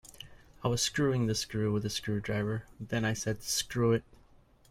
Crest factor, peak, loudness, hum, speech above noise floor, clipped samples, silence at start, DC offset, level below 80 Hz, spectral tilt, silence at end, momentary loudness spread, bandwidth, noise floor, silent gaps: 18 dB; -14 dBFS; -32 LUFS; none; 30 dB; under 0.1%; 0.05 s; under 0.1%; -56 dBFS; -4.5 dB/octave; 0.7 s; 8 LU; 16.5 kHz; -61 dBFS; none